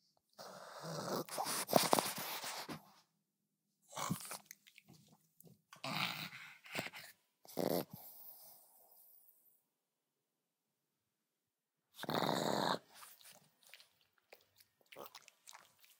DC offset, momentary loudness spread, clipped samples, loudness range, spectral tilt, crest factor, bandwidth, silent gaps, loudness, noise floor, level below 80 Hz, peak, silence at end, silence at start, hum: under 0.1%; 25 LU; under 0.1%; 11 LU; -3 dB/octave; 34 dB; 17.5 kHz; none; -40 LUFS; under -90 dBFS; -86 dBFS; -10 dBFS; 0.35 s; 0.4 s; none